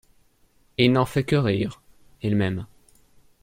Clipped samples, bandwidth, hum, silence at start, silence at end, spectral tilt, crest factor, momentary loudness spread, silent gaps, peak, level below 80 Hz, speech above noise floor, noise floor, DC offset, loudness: under 0.1%; 16 kHz; none; 0.8 s; 0.75 s; -7 dB/octave; 22 dB; 14 LU; none; -2 dBFS; -54 dBFS; 39 dB; -61 dBFS; under 0.1%; -24 LUFS